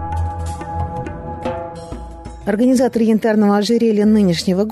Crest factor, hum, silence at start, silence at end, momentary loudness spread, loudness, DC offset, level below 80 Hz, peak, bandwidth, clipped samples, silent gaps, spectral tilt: 10 dB; none; 0 s; 0 s; 16 LU; -17 LUFS; under 0.1%; -34 dBFS; -6 dBFS; 13.5 kHz; under 0.1%; none; -6.5 dB/octave